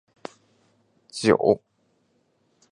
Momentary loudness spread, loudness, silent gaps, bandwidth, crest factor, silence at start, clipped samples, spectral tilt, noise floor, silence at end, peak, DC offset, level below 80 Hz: 23 LU; -22 LUFS; none; 11 kHz; 24 dB; 1.15 s; under 0.1%; -5.5 dB/octave; -68 dBFS; 1.15 s; -4 dBFS; under 0.1%; -62 dBFS